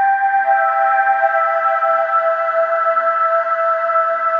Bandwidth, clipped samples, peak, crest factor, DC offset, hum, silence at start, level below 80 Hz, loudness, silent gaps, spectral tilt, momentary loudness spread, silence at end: 5.4 kHz; under 0.1%; -4 dBFS; 12 dB; under 0.1%; none; 0 s; under -90 dBFS; -15 LUFS; none; -2 dB/octave; 2 LU; 0 s